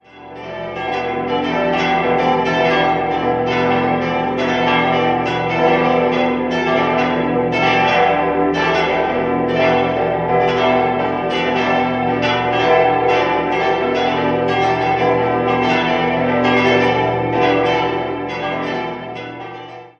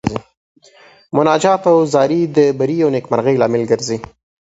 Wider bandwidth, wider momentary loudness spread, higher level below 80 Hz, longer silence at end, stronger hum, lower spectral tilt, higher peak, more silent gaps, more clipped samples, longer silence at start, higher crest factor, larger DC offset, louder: second, 7.2 kHz vs 8 kHz; about the same, 8 LU vs 10 LU; first, -44 dBFS vs -50 dBFS; second, 0.1 s vs 0.35 s; neither; about the same, -6 dB/octave vs -6 dB/octave; about the same, -2 dBFS vs 0 dBFS; second, none vs 0.37-0.55 s; neither; about the same, 0.15 s vs 0.05 s; about the same, 16 dB vs 16 dB; neither; about the same, -16 LUFS vs -15 LUFS